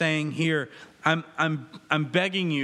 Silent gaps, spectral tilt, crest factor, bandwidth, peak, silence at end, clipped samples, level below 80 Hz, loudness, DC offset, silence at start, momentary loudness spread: none; -5.5 dB/octave; 22 dB; 11.5 kHz; -6 dBFS; 0 s; under 0.1%; -76 dBFS; -26 LUFS; under 0.1%; 0 s; 5 LU